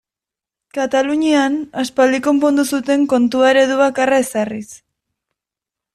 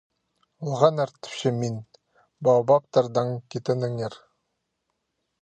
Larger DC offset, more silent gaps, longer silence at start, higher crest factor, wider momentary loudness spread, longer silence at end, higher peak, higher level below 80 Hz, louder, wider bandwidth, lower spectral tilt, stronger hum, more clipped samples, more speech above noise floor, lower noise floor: neither; neither; first, 0.75 s vs 0.6 s; second, 14 dB vs 22 dB; about the same, 10 LU vs 12 LU; about the same, 1.2 s vs 1.25 s; about the same, -2 dBFS vs -4 dBFS; first, -60 dBFS vs -70 dBFS; first, -15 LUFS vs -24 LUFS; first, 14 kHz vs 9.2 kHz; second, -3.5 dB/octave vs -6.5 dB/octave; neither; neither; first, 72 dB vs 55 dB; first, -87 dBFS vs -78 dBFS